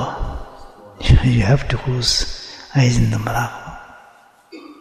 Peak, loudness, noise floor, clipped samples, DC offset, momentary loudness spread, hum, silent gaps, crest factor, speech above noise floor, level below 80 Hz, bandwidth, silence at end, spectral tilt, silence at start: -2 dBFS; -18 LUFS; -49 dBFS; under 0.1%; under 0.1%; 20 LU; none; none; 18 dB; 32 dB; -26 dBFS; 13.5 kHz; 0.1 s; -5 dB/octave; 0 s